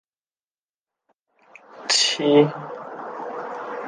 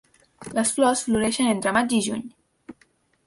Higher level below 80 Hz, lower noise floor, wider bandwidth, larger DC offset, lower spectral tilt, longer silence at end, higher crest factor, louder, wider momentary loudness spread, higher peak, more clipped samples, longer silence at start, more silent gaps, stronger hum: second, -78 dBFS vs -56 dBFS; first, under -90 dBFS vs -63 dBFS; second, 10 kHz vs 11.5 kHz; neither; about the same, -3 dB/octave vs -3.5 dB/octave; second, 0 s vs 0.55 s; about the same, 22 dB vs 18 dB; about the same, -20 LUFS vs -22 LUFS; first, 17 LU vs 13 LU; first, -2 dBFS vs -8 dBFS; neither; first, 1.7 s vs 0.4 s; neither; neither